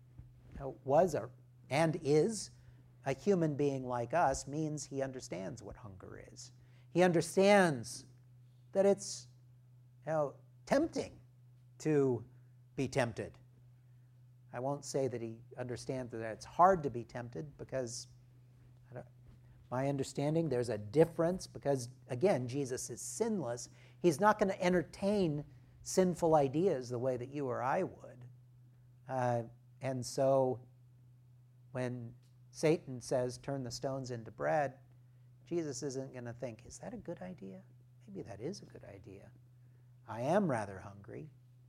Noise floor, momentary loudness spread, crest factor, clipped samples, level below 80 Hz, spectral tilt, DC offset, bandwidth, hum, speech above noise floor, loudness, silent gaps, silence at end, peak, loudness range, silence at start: -62 dBFS; 20 LU; 22 dB; under 0.1%; -66 dBFS; -5.5 dB/octave; under 0.1%; 15.5 kHz; none; 27 dB; -35 LUFS; none; 0.4 s; -14 dBFS; 9 LU; 0.15 s